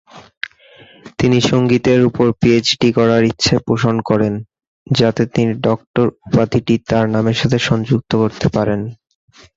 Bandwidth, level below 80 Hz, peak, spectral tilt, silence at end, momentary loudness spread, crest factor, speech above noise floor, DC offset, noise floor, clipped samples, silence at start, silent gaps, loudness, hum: 7.8 kHz; -42 dBFS; -2 dBFS; -6 dB/octave; 0.6 s; 7 LU; 14 dB; 30 dB; under 0.1%; -45 dBFS; under 0.1%; 0.15 s; 0.37-0.41 s, 4.67-4.86 s, 5.87-5.94 s; -15 LUFS; none